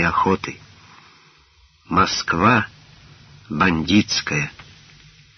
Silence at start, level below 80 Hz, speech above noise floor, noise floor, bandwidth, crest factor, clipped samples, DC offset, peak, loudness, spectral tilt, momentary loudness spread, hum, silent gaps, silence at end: 0 s; -46 dBFS; 36 dB; -55 dBFS; 6.6 kHz; 20 dB; under 0.1%; under 0.1%; -2 dBFS; -19 LUFS; -3.5 dB/octave; 15 LU; none; none; 0.75 s